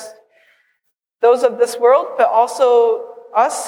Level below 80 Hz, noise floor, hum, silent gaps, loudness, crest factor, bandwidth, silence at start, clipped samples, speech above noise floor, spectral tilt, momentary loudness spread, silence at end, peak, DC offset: -82 dBFS; -71 dBFS; none; none; -15 LUFS; 14 dB; 14.5 kHz; 0 s; under 0.1%; 56 dB; -2 dB/octave; 5 LU; 0 s; -2 dBFS; under 0.1%